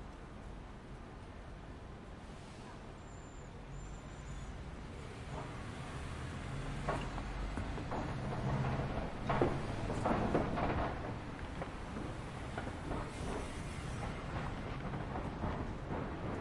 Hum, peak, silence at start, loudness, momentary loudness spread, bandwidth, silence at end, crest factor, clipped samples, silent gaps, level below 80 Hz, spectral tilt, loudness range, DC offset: none; -16 dBFS; 0 s; -42 LUFS; 15 LU; 11.5 kHz; 0 s; 24 dB; under 0.1%; none; -48 dBFS; -6.5 dB/octave; 13 LU; under 0.1%